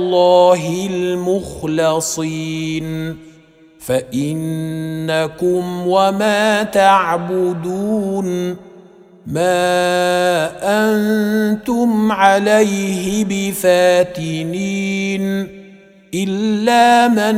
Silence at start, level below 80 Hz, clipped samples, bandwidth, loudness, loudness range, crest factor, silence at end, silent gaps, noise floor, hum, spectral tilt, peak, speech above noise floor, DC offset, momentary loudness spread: 0 s; -50 dBFS; under 0.1%; 16.5 kHz; -16 LUFS; 6 LU; 16 dB; 0 s; none; -46 dBFS; none; -5 dB/octave; 0 dBFS; 31 dB; under 0.1%; 11 LU